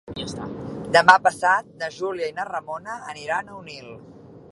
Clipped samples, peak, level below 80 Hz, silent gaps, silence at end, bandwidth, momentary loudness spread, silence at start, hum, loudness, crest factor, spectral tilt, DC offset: under 0.1%; 0 dBFS; -56 dBFS; none; 0.1 s; 11.5 kHz; 22 LU; 0.05 s; none; -21 LUFS; 24 dB; -3.5 dB/octave; under 0.1%